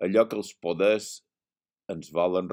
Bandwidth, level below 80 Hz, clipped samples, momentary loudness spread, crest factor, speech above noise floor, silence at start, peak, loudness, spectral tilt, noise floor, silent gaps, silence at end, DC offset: 16 kHz; -70 dBFS; under 0.1%; 15 LU; 20 dB; over 64 dB; 0 s; -8 dBFS; -26 LUFS; -5 dB/octave; under -90 dBFS; none; 0 s; under 0.1%